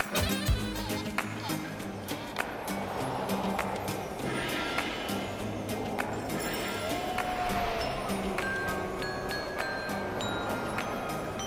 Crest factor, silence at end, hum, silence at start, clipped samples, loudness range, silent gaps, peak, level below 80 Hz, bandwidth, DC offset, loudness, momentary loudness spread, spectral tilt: 20 dB; 0 s; none; 0 s; under 0.1%; 2 LU; none; -12 dBFS; -46 dBFS; over 20 kHz; under 0.1%; -33 LUFS; 4 LU; -4.5 dB/octave